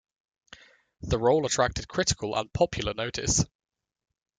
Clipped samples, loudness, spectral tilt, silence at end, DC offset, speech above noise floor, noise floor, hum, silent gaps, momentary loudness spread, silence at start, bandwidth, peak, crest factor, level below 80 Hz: under 0.1%; -27 LUFS; -3.5 dB/octave; 0.95 s; under 0.1%; 27 dB; -54 dBFS; none; none; 7 LU; 1 s; 10 kHz; -10 dBFS; 20 dB; -46 dBFS